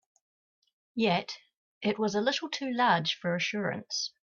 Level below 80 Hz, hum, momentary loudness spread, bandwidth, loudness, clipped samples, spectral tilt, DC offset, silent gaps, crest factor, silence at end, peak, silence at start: -74 dBFS; none; 9 LU; 7.2 kHz; -30 LUFS; under 0.1%; -4 dB/octave; under 0.1%; 1.57-1.81 s; 18 dB; 0.15 s; -12 dBFS; 0.95 s